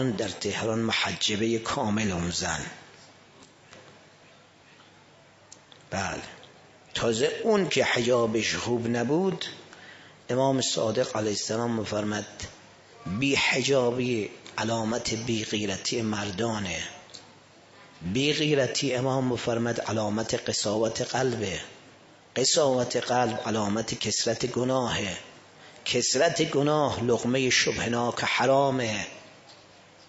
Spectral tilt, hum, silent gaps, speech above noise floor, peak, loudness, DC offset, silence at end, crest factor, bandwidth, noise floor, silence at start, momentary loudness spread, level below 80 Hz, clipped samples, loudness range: -3.5 dB/octave; none; none; 29 dB; -10 dBFS; -26 LUFS; under 0.1%; 0.55 s; 18 dB; 8 kHz; -55 dBFS; 0 s; 13 LU; -58 dBFS; under 0.1%; 7 LU